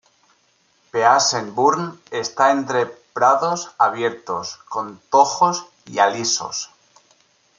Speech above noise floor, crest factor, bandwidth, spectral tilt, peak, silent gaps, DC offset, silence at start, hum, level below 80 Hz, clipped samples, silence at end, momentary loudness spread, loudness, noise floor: 42 dB; 18 dB; 9.6 kHz; -2.5 dB/octave; -2 dBFS; none; under 0.1%; 0.95 s; none; -70 dBFS; under 0.1%; 0.95 s; 12 LU; -19 LUFS; -61 dBFS